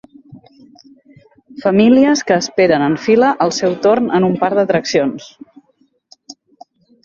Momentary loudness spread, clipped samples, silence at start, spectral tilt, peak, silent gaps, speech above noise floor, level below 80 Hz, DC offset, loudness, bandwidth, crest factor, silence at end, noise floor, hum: 6 LU; under 0.1%; 0.3 s; -5 dB/octave; 0 dBFS; none; 45 dB; -56 dBFS; under 0.1%; -14 LUFS; 7.8 kHz; 14 dB; 0.75 s; -59 dBFS; none